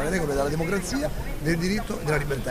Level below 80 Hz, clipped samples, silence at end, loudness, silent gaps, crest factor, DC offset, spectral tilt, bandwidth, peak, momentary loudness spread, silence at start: -34 dBFS; under 0.1%; 0 s; -26 LUFS; none; 14 dB; under 0.1%; -5.5 dB/octave; 15.5 kHz; -12 dBFS; 4 LU; 0 s